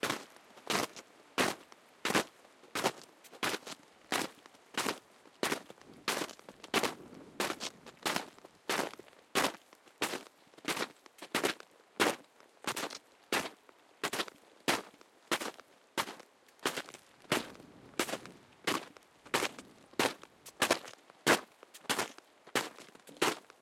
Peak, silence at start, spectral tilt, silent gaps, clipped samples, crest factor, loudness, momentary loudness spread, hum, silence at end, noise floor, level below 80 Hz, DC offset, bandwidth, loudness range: -12 dBFS; 0.05 s; -2 dB/octave; none; under 0.1%; 28 dB; -36 LUFS; 20 LU; none; 0.25 s; -62 dBFS; -78 dBFS; under 0.1%; 16.5 kHz; 4 LU